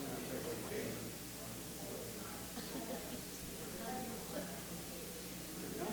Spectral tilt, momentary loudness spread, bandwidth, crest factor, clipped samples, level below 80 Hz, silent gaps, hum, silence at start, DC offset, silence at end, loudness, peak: -3.5 dB/octave; 3 LU; over 20 kHz; 16 dB; under 0.1%; -62 dBFS; none; 60 Hz at -55 dBFS; 0 s; under 0.1%; 0 s; -45 LUFS; -30 dBFS